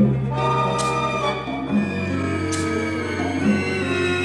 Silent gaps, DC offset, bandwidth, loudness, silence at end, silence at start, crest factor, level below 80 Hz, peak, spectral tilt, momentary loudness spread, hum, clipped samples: none; under 0.1%; 12 kHz; -22 LUFS; 0 s; 0 s; 16 dB; -46 dBFS; -6 dBFS; -5.5 dB/octave; 4 LU; none; under 0.1%